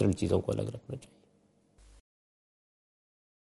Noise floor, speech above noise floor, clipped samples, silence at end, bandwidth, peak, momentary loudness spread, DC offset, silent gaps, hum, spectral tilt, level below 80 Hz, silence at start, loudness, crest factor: -68 dBFS; 37 dB; under 0.1%; 2.4 s; 11.5 kHz; -14 dBFS; 16 LU; under 0.1%; none; none; -7.5 dB/octave; -60 dBFS; 0 s; -33 LUFS; 20 dB